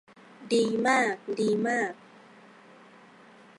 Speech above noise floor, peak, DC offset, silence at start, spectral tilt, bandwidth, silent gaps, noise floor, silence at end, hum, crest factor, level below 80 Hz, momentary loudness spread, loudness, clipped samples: 28 dB; -10 dBFS; under 0.1%; 0.4 s; -4.5 dB/octave; 11.5 kHz; none; -54 dBFS; 1.65 s; none; 20 dB; -78 dBFS; 7 LU; -27 LUFS; under 0.1%